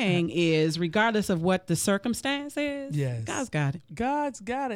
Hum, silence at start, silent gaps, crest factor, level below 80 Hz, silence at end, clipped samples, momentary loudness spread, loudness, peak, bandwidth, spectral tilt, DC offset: none; 0 s; none; 16 dB; -58 dBFS; 0 s; under 0.1%; 7 LU; -27 LUFS; -12 dBFS; 16.5 kHz; -5 dB/octave; under 0.1%